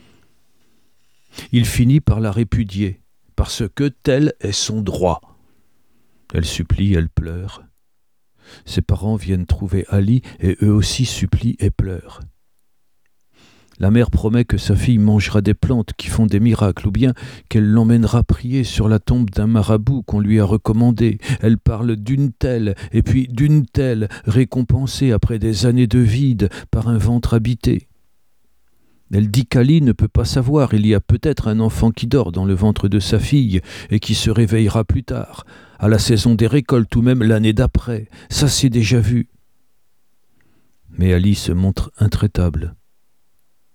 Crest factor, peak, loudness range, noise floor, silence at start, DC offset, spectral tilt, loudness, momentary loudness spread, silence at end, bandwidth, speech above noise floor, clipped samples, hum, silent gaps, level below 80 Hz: 16 dB; -2 dBFS; 5 LU; -73 dBFS; 1.35 s; 0.2%; -6.5 dB/octave; -17 LUFS; 8 LU; 1 s; 15.5 kHz; 58 dB; under 0.1%; none; none; -30 dBFS